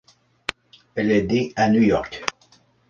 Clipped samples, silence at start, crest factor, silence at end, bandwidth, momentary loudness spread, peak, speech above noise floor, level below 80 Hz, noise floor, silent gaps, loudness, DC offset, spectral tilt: under 0.1%; 0.5 s; 20 dB; 0.6 s; 9 kHz; 14 LU; -2 dBFS; 38 dB; -50 dBFS; -57 dBFS; none; -22 LUFS; under 0.1%; -6 dB/octave